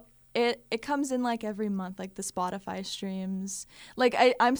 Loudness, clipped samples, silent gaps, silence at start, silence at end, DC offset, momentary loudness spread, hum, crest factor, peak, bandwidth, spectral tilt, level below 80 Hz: -30 LUFS; under 0.1%; none; 0.35 s; 0 s; under 0.1%; 13 LU; none; 20 dB; -10 dBFS; over 20 kHz; -4 dB/octave; -66 dBFS